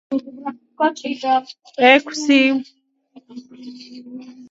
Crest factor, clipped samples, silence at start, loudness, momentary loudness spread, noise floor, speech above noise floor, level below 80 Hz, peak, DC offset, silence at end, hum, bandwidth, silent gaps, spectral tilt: 20 dB; under 0.1%; 0.1 s; -17 LUFS; 25 LU; -50 dBFS; 31 dB; -74 dBFS; 0 dBFS; under 0.1%; 0.05 s; none; 7.8 kHz; none; -2.5 dB/octave